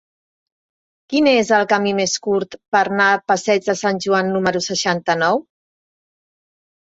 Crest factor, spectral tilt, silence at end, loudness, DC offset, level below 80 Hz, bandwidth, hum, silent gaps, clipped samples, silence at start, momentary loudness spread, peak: 16 dB; -3.5 dB/octave; 1.55 s; -17 LUFS; under 0.1%; -62 dBFS; 8 kHz; none; 2.68-2.72 s; under 0.1%; 1.1 s; 5 LU; -2 dBFS